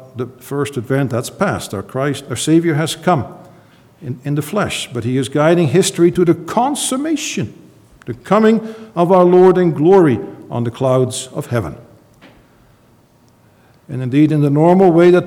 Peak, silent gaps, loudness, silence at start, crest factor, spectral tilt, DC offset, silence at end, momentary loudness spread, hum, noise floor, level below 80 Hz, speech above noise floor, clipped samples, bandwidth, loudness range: 0 dBFS; none; -15 LUFS; 0 s; 16 dB; -6 dB/octave; under 0.1%; 0 s; 16 LU; none; -51 dBFS; -52 dBFS; 37 dB; under 0.1%; 16 kHz; 8 LU